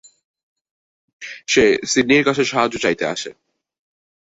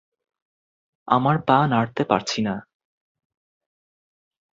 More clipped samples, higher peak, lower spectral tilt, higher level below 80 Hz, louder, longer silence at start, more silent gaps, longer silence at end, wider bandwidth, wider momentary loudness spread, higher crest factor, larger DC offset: neither; about the same, -2 dBFS vs -2 dBFS; second, -3.5 dB/octave vs -6 dB/octave; first, -54 dBFS vs -60 dBFS; first, -17 LUFS vs -21 LUFS; first, 1.2 s vs 1.05 s; neither; second, 0.9 s vs 2 s; about the same, 8 kHz vs 7.8 kHz; first, 18 LU vs 8 LU; about the same, 18 dB vs 22 dB; neither